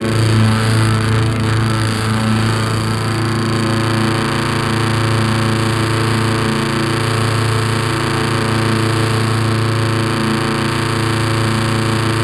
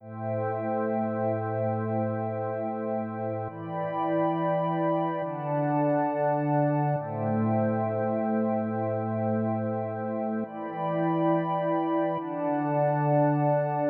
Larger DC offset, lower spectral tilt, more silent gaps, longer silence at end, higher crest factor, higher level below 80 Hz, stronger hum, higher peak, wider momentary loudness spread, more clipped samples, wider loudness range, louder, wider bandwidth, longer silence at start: neither; second, -5.5 dB/octave vs -12 dB/octave; neither; about the same, 0 s vs 0 s; about the same, 12 dB vs 14 dB; first, -36 dBFS vs -76 dBFS; neither; first, -2 dBFS vs -14 dBFS; second, 2 LU vs 6 LU; neither; second, 0 LU vs 3 LU; first, -16 LUFS vs -28 LUFS; first, 13.5 kHz vs 4.1 kHz; about the same, 0 s vs 0 s